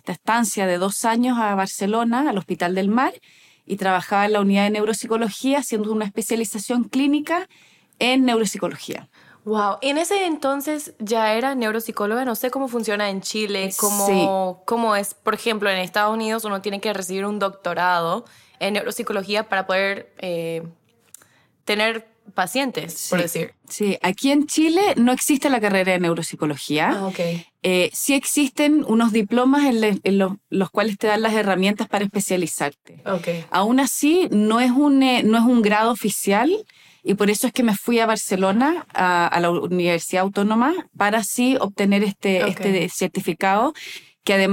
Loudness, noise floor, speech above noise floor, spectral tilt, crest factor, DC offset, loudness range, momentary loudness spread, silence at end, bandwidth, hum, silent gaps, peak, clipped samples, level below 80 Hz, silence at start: -20 LUFS; -57 dBFS; 37 dB; -4 dB/octave; 14 dB; under 0.1%; 5 LU; 8 LU; 0 s; 17 kHz; none; none; -6 dBFS; under 0.1%; -64 dBFS; 0.05 s